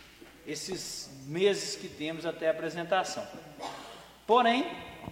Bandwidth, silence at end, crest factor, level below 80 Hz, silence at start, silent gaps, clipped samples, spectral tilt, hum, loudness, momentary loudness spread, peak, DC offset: 16.5 kHz; 0 s; 22 dB; -66 dBFS; 0 s; none; under 0.1%; -3.5 dB/octave; none; -31 LUFS; 17 LU; -10 dBFS; under 0.1%